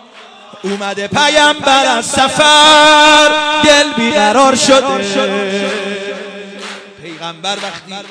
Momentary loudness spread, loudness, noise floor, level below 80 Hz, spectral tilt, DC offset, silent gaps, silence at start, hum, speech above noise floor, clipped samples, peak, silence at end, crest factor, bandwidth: 22 LU; -9 LUFS; -37 dBFS; -48 dBFS; -2 dB/octave; under 0.1%; none; 0.15 s; none; 27 dB; under 0.1%; 0 dBFS; 0 s; 12 dB; 11 kHz